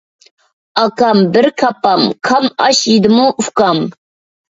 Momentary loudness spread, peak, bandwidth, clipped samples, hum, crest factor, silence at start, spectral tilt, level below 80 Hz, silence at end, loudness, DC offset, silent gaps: 6 LU; 0 dBFS; 7.8 kHz; under 0.1%; none; 12 dB; 0.75 s; -4 dB/octave; -56 dBFS; 0.6 s; -12 LUFS; under 0.1%; none